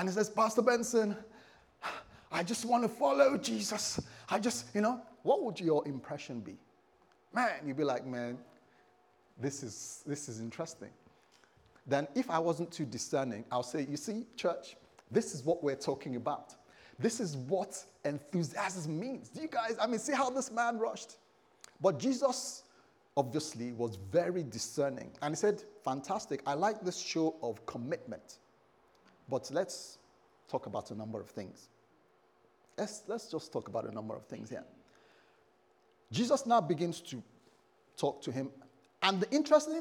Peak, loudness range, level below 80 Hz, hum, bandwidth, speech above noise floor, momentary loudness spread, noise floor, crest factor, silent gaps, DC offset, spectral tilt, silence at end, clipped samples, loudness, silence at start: -12 dBFS; 10 LU; -78 dBFS; none; 19.5 kHz; 35 dB; 14 LU; -69 dBFS; 24 dB; none; under 0.1%; -4.5 dB/octave; 0 s; under 0.1%; -35 LUFS; 0 s